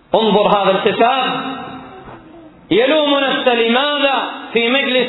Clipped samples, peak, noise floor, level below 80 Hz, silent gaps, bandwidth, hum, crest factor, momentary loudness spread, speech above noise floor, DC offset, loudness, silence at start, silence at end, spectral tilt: under 0.1%; 0 dBFS; -40 dBFS; -54 dBFS; none; 4.1 kHz; none; 16 dB; 13 LU; 26 dB; under 0.1%; -14 LUFS; 0.1 s; 0 s; -7.5 dB/octave